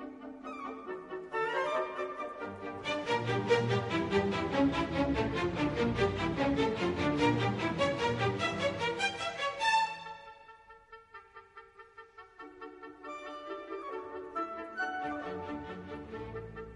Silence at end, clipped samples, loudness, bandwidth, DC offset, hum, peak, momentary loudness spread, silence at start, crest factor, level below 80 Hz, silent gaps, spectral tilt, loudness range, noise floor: 0 s; under 0.1%; -33 LUFS; 10.5 kHz; under 0.1%; none; -14 dBFS; 22 LU; 0 s; 20 dB; -54 dBFS; none; -5.5 dB/octave; 14 LU; -56 dBFS